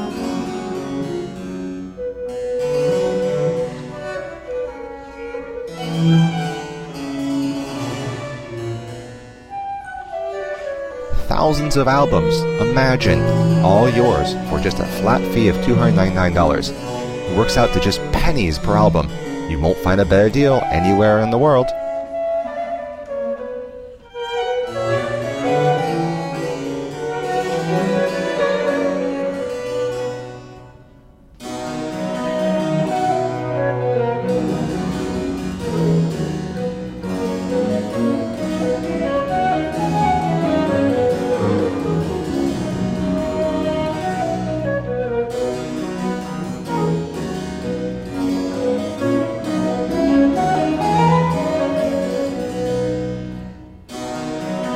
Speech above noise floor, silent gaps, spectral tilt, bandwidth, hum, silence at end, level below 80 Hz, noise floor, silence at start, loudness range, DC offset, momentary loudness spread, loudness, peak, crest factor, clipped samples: 31 dB; none; -6.5 dB/octave; 15.5 kHz; none; 0 s; -34 dBFS; -46 dBFS; 0 s; 8 LU; under 0.1%; 13 LU; -19 LUFS; -2 dBFS; 18 dB; under 0.1%